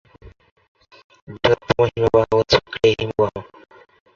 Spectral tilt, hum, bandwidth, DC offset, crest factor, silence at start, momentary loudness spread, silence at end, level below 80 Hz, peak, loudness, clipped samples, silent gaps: -5.5 dB/octave; none; 7.4 kHz; under 0.1%; 20 dB; 0.25 s; 6 LU; 0.75 s; -44 dBFS; -2 dBFS; -18 LUFS; under 0.1%; 0.51-0.56 s, 0.68-0.75 s, 1.04-1.10 s, 1.22-1.27 s